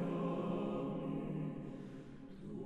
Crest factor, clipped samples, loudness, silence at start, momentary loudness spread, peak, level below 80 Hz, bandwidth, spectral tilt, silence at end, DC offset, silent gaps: 14 dB; under 0.1%; -42 LUFS; 0 s; 13 LU; -26 dBFS; -62 dBFS; 9 kHz; -9 dB/octave; 0 s; under 0.1%; none